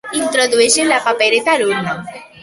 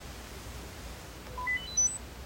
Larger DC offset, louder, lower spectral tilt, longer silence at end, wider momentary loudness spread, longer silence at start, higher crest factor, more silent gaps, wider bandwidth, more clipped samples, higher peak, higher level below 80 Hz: neither; first, -13 LUFS vs -29 LUFS; about the same, -2 dB/octave vs -1 dB/octave; first, 0.15 s vs 0 s; second, 12 LU vs 17 LU; about the same, 0.05 s vs 0 s; about the same, 14 dB vs 16 dB; neither; second, 12 kHz vs 16 kHz; neither; first, 0 dBFS vs -20 dBFS; second, -58 dBFS vs -48 dBFS